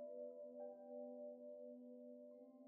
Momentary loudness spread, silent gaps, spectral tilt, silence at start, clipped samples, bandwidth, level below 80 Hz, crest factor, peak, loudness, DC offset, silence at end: 6 LU; none; -5 dB/octave; 0 s; under 0.1%; 1.7 kHz; under -90 dBFS; 12 dB; -44 dBFS; -56 LUFS; under 0.1%; 0 s